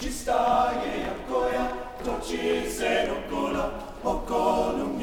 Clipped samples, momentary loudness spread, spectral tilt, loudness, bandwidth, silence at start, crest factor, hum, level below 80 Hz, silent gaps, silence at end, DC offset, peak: under 0.1%; 8 LU; -4 dB/octave; -27 LUFS; over 20 kHz; 0 s; 16 dB; none; -42 dBFS; none; 0 s; under 0.1%; -10 dBFS